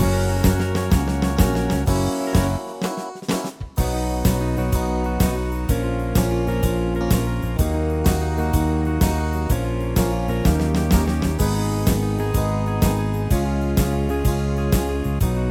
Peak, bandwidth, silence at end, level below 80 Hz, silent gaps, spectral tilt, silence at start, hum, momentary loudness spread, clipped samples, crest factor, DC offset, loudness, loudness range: -4 dBFS; 20 kHz; 0 s; -26 dBFS; none; -6.5 dB/octave; 0 s; none; 4 LU; under 0.1%; 16 dB; under 0.1%; -21 LUFS; 2 LU